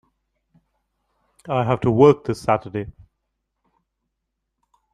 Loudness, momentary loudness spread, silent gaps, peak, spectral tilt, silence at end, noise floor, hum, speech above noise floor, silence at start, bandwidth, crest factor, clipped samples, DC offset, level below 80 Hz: -19 LUFS; 16 LU; none; -2 dBFS; -8 dB/octave; 2.05 s; -78 dBFS; none; 60 dB; 1.45 s; 11 kHz; 22 dB; under 0.1%; under 0.1%; -54 dBFS